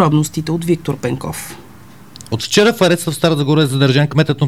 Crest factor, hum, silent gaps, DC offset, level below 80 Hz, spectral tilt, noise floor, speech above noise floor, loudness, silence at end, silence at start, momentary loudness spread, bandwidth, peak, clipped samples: 14 dB; none; none; 0.7%; -48 dBFS; -5.5 dB/octave; -40 dBFS; 26 dB; -15 LUFS; 0 s; 0 s; 12 LU; 15.5 kHz; 0 dBFS; under 0.1%